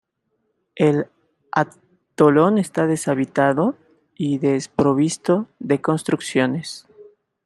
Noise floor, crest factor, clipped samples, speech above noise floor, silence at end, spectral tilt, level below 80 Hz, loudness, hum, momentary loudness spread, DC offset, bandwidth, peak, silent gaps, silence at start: -72 dBFS; 18 dB; under 0.1%; 53 dB; 0.4 s; -6 dB/octave; -64 dBFS; -20 LUFS; none; 11 LU; under 0.1%; 12.5 kHz; -2 dBFS; none; 0.75 s